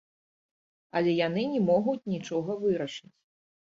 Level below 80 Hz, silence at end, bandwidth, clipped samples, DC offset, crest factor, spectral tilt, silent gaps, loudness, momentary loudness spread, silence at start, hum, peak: -70 dBFS; 0.75 s; 7.8 kHz; under 0.1%; under 0.1%; 16 dB; -6.5 dB/octave; none; -28 LUFS; 9 LU; 0.95 s; none; -14 dBFS